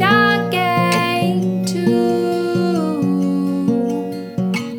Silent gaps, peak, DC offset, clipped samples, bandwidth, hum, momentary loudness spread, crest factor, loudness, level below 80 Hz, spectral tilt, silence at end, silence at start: none; -2 dBFS; under 0.1%; under 0.1%; 19.5 kHz; none; 6 LU; 16 dB; -17 LUFS; -58 dBFS; -6 dB/octave; 0 s; 0 s